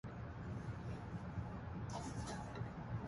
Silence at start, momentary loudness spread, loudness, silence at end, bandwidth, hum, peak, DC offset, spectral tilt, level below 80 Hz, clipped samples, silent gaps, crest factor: 0.05 s; 2 LU; -47 LUFS; 0 s; 11.5 kHz; none; -32 dBFS; under 0.1%; -6.5 dB/octave; -56 dBFS; under 0.1%; none; 14 dB